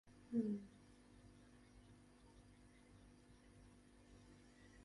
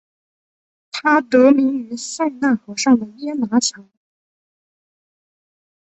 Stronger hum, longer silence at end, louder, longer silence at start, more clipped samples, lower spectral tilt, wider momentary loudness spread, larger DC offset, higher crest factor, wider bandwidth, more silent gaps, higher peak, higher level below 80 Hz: neither; second, 0.05 s vs 2.05 s; second, -45 LUFS vs -17 LUFS; second, 0.05 s vs 0.95 s; neither; first, -7.5 dB/octave vs -3.5 dB/octave; first, 23 LU vs 13 LU; neither; first, 24 dB vs 18 dB; first, 11.5 kHz vs 8.2 kHz; neither; second, -30 dBFS vs -2 dBFS; second, -72 dBFS vs -66 dBFS